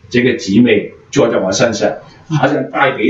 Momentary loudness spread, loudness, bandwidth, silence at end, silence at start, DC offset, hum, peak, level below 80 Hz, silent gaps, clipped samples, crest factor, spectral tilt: 8 LU; -14 LUFS; 8 kHz; 0 s; 0.1 s; under 0.1%; none; 0 dBFS; -50 dBFS; none; under 0.1%; 14 dB; -5 dB/octave